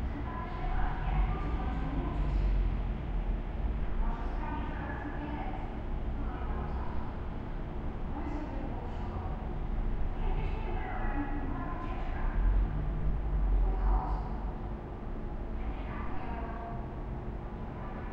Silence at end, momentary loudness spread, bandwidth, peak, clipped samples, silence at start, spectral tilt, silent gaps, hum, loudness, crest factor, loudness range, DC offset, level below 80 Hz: 0 s; 8 LU; 4.8 kHz; -18 dBFS; under 0.1%; 0 s; -9 dB/octave; none; none; -37 LUFS; 14 dB; 5 LU; under 0.1%; -34 dBFS